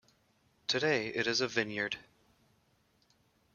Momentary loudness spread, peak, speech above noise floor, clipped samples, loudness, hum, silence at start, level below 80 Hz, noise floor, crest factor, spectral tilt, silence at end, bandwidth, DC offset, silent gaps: 9 LU; -12 dBFS; 39 dB; under 0.1%; -33 LUFS; none; 0.7 s; -74 dBFS; -72 dBFS; 24 dB; -3 dB/octave; 1.55 s; 12 kHz; under 0.1%; none